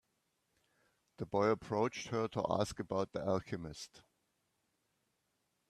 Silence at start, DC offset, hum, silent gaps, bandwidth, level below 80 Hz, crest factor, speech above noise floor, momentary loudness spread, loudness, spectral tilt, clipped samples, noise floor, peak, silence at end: 1.2 s; under 0.1%; none; none; 13.5 kHz; -68 dBFS; 22 dB; 45 dB; 14 LU; -37 LUFS; -6 dB/octave; under 0.1%; -82 dBFS; -18 dBFS; 1.7 s